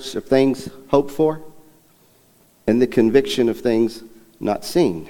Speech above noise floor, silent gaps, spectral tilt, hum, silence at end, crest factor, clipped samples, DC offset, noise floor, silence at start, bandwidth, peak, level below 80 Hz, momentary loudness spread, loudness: 37 dB; none; -6 dB/octave; none; 0 s; 18 dB; under 0.1%; under 0.1%; -55 dBFS; 0 s; 19 kHz; -2 dBFS; -48 dBFS; 11 LU; -19 LUFS